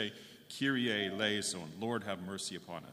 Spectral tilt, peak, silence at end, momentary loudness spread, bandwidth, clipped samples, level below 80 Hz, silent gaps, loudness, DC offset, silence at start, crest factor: -3.5 dB/octave; -18 dBFS; 0 s; 11 LU; 15.5 kHz; under 0.1%; -78 dBFS; none; -36 LUFS; under 0.1%; 0 s; 18 dB